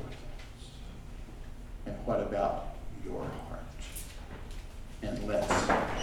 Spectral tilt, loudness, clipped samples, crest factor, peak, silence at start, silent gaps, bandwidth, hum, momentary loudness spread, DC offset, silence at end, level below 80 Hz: -5 dB/octave; -35 LUFS; under 0.1%; 22 dB; -14 dBFS; 0 s; none; 18.5 kHz; none; 19 LU; under 0.1%; 0 s; -44 dBFS